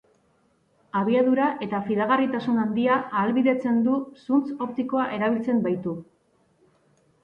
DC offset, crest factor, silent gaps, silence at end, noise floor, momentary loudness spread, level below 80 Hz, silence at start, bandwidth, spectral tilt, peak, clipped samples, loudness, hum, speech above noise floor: under 0.1%; 16 dB; none; 1.2 s; -65 dBFS; 7 LU; -68 dBFS; 0.95 s; 5.4 kHz; -8.5 dB/octave; -10 dBFS; under 0.1%; -24 LUFS; none; 42 dB